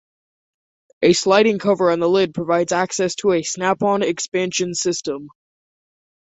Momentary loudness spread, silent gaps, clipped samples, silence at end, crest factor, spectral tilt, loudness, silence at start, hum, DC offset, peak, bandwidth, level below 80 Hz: 7 LU; none; under 0.1%; 1 s; 18 dB; -4 dB/octave; -18 LUFS; 1 s; none; under 0.1%; -2 dBFS; 8.4 kHz; -60 dBFS